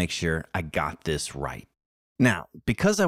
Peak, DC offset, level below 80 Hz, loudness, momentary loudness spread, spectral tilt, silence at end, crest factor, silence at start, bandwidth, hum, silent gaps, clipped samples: -8 dBFS; under 0.1%; -46 dBFS; -27 LUFS; 10 LU; -5 dB/octave; 0 s; 18 dB; 0 s; 15.5 kHz; none; 1.86-2.16 s; under 0.1%